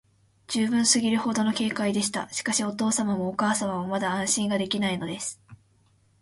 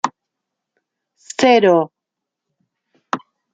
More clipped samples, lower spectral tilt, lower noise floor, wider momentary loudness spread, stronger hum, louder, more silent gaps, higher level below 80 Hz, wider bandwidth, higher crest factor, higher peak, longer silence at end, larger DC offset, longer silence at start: neither; second, -3 dB/octave vs -4.5 dB/octave; second, -63 dBFS vs -82 dBFS; second, 8 LU vs 16 LU; neither; second, -25 LUFS vs -16 LUFS; neither; about the same, -64 dBFS vs -68 dBFS; first, 11.5 kHz vs 9.2 kHz; about the same, 20 dB vs 18 dB; second, -6 dBFS vs -2 dBFS; first, 0.65 s vs 0.35 s; neither; first, 0.5 s vs 0.05 s